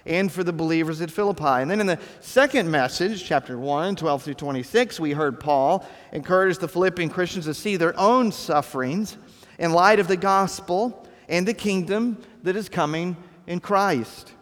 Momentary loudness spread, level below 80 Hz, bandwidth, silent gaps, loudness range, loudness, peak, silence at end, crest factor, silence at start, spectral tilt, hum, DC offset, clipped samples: 10 LU; -60 dBFS; 18.5 kHz; none; 3 LU; -23 LUFS; -2 dBFS; 0.1 s; 22 dB; 0.05 s; -5.5 dB/octave; none; under 0.1%; under 0.1%